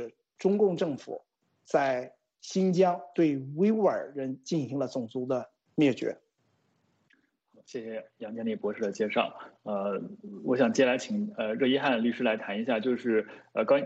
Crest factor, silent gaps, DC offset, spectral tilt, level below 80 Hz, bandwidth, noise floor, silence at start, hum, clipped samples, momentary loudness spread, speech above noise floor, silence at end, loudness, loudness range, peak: 18 dB; none; under 0.1%; -6 dB/octave; -76 dBFS; 8.2 kHz; -73 dBFS; 0 s; none; under 0.1%; 15 LU; 44 dB; 0 s; -29 LUFS; 7 LU; -12 dBFS